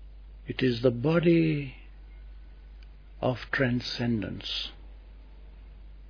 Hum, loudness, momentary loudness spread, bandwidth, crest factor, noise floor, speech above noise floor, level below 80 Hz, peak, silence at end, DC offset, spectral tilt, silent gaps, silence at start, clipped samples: none; -28 LUFS; 26 LU; 5.4 kHz; 20 dB; -47 dBFS; 21 dB; -46 dBFS; -10 dBFS; 0 s; under 0.1%; -7.5 dB/octave; none; 0 s; under 0.1%